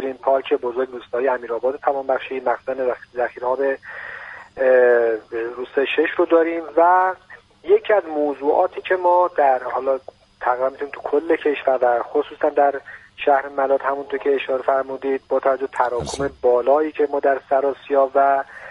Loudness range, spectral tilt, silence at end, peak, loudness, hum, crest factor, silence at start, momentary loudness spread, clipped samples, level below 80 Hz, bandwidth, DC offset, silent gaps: 4 LU; -5 dB/octave; 0 s; -4 dBFS; -20 LUFS; none; 16 dB; 0 s; 9 LU; under 0.1%; -56 dBFS; 11 kHz; under 0.1%; none